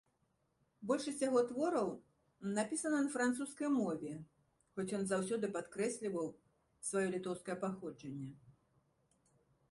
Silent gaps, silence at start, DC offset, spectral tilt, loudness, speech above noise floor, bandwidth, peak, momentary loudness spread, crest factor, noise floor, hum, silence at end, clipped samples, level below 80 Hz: none; 0.8 s; under 0.1%; -5 dB/octave; -39 LUFS; 42 dB; 11.5 kHz; -22 dBFS; 13 LU; 18 dB; -80 dBFS; none; 1.2 s; under 0.1%; -78 dBFS